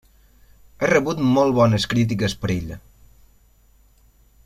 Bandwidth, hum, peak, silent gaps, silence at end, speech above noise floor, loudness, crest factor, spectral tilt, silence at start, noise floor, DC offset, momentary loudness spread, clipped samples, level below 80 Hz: 14.5 kHz; none; -2 dBFS; none; 1.7 s; 36 dB; -20 LUFS; 20 dB; -6 dB/octave; 0.8 s; -55 dBFS; under 0.1%; 10 LU; under 0.1%; -46 dBFS